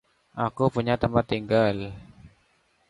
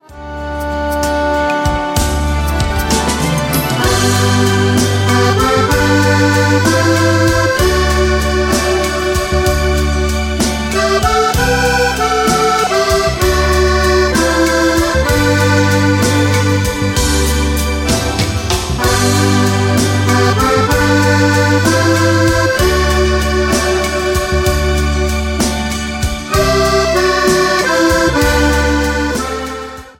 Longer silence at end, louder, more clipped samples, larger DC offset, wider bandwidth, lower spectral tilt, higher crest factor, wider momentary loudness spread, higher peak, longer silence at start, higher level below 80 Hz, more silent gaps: first, 0.6 s vs 0.1 s; second, -25 LUFS vs -13 LUFS; neither; neither; second, 11.5 kHz vs 16.5 kHz; first, -8 dB/octave vs -4.5 dB/octave; first, 18 dB vs 12 dB; first, 16 LU vs 5 LU; second, -8 dBFS vs 0 dBFS; first, 0.35 s vs 0.1 s; second, -50 dBFS vs -22 dBFS; neither